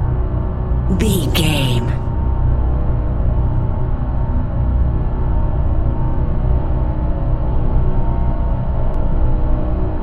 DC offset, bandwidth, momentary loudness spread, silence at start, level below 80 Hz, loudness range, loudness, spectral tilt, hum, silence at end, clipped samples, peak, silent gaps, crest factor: under 0.1%; 14 kHz; 5 LU; 0 s; -16 dBFS; 2 LU; -19 LUFS; -6.5 dB/octave; none; 0 s; under 0.1%; -2 dBFS; none; 14 dB